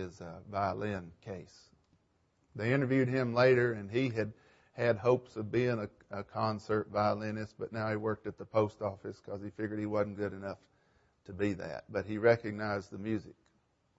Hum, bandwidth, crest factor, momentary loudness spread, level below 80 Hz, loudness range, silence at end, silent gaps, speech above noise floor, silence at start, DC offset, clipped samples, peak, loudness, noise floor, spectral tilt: none; 8 kHz; 20 dB; 15 LU; -68 dBFS; 6 LU; 0.65 s; none; 40 dB; 0 s; under 0.1%; under 0.1%; -14 dBFS; -34 LUFS; -74 dBFS; -7.5 dB/octave